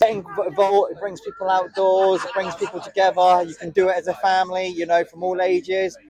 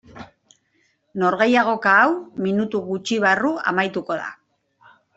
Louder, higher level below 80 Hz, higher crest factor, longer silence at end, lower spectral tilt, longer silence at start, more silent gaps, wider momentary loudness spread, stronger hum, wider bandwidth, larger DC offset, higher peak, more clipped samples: about the same, -20 LUFS vs -19 LUFS; about the same, -64 dBFS vs -64 dBFS; about the same, 14 dB vs 18 dB; second, 0.15 s vs 0.8 s; about the same, -4.5 dB/octave vs -5 dB/octave; second, 0 s vs 0.15 s; neither; second, 9 LU vs 12 LU; neither; first, 11 kHz vs 8.2 kHz; neither; second, -6 dBFS vs -2 dBFS; neither